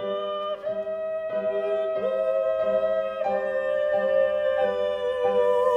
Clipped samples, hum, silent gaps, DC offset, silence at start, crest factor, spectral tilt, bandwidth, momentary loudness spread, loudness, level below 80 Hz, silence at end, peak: under 0.1%; none; none; under 0.1%; 0 s; 12 dB; -5.5 dB/octave; 8.4 kHz; 7 LU; -25 LUFS; -62 dBFS; 0 s; -12 dBFS